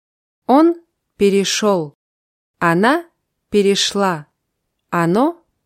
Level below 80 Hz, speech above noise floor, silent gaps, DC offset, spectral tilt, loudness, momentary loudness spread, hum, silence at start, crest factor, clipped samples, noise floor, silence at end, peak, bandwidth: -58 dBFS; 59 dB; 1.95-2.54 s; under 0.1%; -4.5 dB/octave; -16 LUFS; 10 LU; none; 0.5 s; 16 dB; under 0.1%; -73 dBFS; 0.3 s; -2 dBFS; 15 kHz